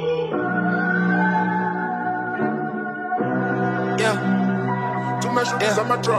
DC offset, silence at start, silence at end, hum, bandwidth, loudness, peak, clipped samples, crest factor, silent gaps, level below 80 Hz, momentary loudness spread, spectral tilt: under 0.1%; 0 s; 0 s; none; 13 kHz; -22 LUFS; -8 dBFS; under 0.1%; 14 dB; none; -66 dBFS; 5 LU; -6 dB/octave